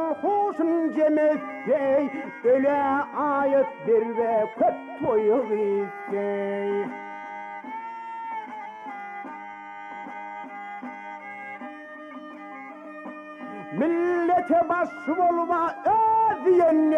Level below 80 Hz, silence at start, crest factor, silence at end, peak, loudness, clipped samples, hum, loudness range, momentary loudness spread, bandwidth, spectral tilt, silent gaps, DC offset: -70 dBFS; 0 s; 14 dB; 0 s; -12 dBFS; -24 LUFS; under 0.1%; none; 15 LU; 18 LU; 7.8 kHz; -7.5 dB/octave; none; under 0.1%